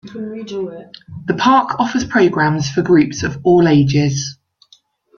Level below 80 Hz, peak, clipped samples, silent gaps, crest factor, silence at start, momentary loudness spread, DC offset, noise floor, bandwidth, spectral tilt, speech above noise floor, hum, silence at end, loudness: -48 dBFS; 0 dBFS; under 0.1%; none; 16 dB; 0.05 s; 16 LU; under 0.1%; -53 dBFS; 7.2 kHz; -6 dB/octave; 38 dB; none; 0.85 s; -15 LUFS